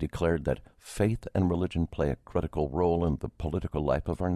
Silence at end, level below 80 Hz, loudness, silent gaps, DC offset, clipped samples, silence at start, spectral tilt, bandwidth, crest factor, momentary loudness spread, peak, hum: 0 s; -40 dBFS; -30 LUFS; none; under 0.1%; under 0.1%; 0 s; -8 dB/octave; 13.5 kHz; 18 dB; 6 LU; -12 dBFS; none